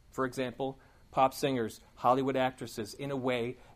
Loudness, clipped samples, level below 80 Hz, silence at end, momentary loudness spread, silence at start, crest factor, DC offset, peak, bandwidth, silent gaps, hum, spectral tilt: -33 LUFS; under 0.1%; -62 dBFS; 0 s; 11 LU; 0.15 s; 20 dB; under 0.1%; -12 dBFS; 15.5 kHz; none; none; -5.5 dB/octave